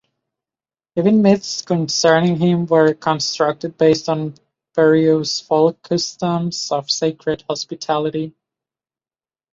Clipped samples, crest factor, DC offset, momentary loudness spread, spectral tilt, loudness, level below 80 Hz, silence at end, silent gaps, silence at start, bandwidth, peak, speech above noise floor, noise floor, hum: under 0.1%; 16 dB; under 0.1%; 10 LU; -5 dB/octave; -17 LUFS; -58 dBFS; 1.25 s; none; 0.95 s; 7.8 kHz; -2 dBFS; over 73 dB; under -90 dBFS; none